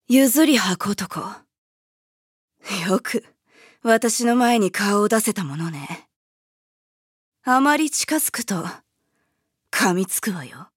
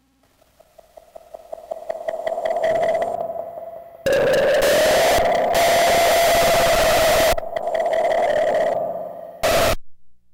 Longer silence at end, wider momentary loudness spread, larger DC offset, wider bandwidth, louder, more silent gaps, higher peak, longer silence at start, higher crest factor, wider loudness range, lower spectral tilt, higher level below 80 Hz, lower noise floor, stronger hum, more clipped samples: first, 0.15 s vs 0 s; about the same, 15 LU vs 16 LU; neither; about the same, 17 kHz vs 18 kHz; about the same, -20 LUFS vs -18 LUFS; first, 1.58-2.48 s, 6.16-7.32 s vs none; first, -4 dBFS vs -10 dBFS; second, 0.1 s vs 1.35 s; first, 20 dB vs 10 dB; second, 4 LU vs 9 LU; about the same, -3.5 dB/octave vs -2.5 dB/octave; second, -72 dBFS vs -40 dBFS; first, -74 dBFS vs -59 dBFS; neither; neither